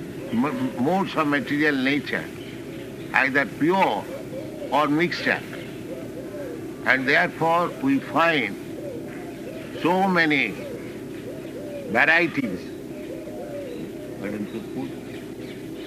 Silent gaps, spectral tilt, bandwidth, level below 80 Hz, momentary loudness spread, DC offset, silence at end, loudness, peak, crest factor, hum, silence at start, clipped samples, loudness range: none; -5.5 dB/octave; 15.5 kHz; -58 dBFS; 16 LU; under 0.1%; 0 s; -23 LUFS; -2 dBFS; 22 dB; none; 0 s; under 0.1%; 3 LU